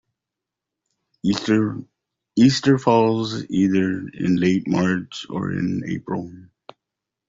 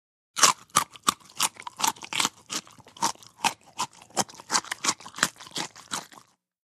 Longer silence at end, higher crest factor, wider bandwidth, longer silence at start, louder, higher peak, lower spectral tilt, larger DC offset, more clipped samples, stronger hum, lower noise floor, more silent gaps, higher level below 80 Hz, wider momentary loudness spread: first, 0.85 s vs 0.45 s; second, 18 dB vs 28 dB; second, 7.8 kHz vs 15.5 kHz; first, 1.25 s vs 0.35 s; first, -21 LUFS vs -27 LUFS; about the same, -4 dBFS vs -2 dBFS; first, -6.5 dB/octave vs 0 dB/octave; neither; neither; neither; first, -85 dBFS vs -55 dBFS; neither; first, -56 dBFS vs -70 dBFS; second, 11 LU vs 14 LU